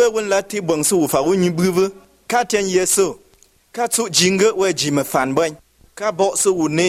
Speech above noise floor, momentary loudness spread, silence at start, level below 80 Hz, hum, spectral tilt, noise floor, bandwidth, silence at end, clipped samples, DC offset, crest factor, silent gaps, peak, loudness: 37 dB; 7 LU; 0 s; -54 dBFS; none; -3.5 dB/octave; -54 dBFS; 16 kHz; 0 s; under 0.1%; under 0.1%; 16 dB; none; -2 dBFS; -17 LUFS